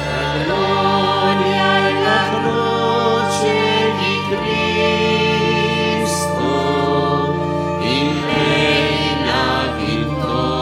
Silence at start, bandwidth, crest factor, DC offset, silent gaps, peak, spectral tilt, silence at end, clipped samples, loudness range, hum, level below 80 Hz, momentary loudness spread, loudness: 0 s; 16 kHz; 16 dB; under 0.1%; none; 0 dBFS; -5 dB/octave; 0 s; under 0.1%; 1 LU; none; -40 dBFS; 4 LU; -16 LUFS